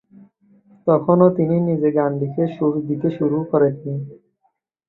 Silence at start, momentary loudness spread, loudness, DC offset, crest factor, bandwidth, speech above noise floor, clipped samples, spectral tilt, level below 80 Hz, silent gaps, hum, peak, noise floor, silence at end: 0.85 s; 12 LU; -19 LUFS; under 0.1%; 18 dB; 4.1 kHz; 50 dB; under 0.1%; -12.5 dB/octave; -62 dBFS; none; none; -2 dBFS; -68 dBFS; 0.75 s